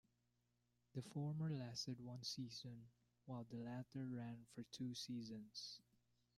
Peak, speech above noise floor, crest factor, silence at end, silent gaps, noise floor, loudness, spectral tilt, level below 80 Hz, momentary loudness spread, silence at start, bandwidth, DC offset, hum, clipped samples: -36 dBFS; 35 dB; 16 dB; 0.55 s; none; -85 dBFS; -51 LUFS; -5.5 dB/octave; -84 dBFS; 10 LU; 0.95 s; 14 kHz; under 0.1%; 60 Hz at -70 dBFS; under 0.1%